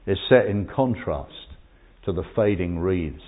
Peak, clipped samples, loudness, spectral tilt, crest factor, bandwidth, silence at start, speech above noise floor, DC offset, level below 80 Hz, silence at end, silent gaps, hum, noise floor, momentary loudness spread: -4 dBFS; under 0.1%; -23 LUFS; -11.5 dB/octave; 20 dB; 4 kHz; 0.05 s; 28 dB; under 0.1%; -40 dBFS; 0 s; none; none; -51 dBFS; 14 LU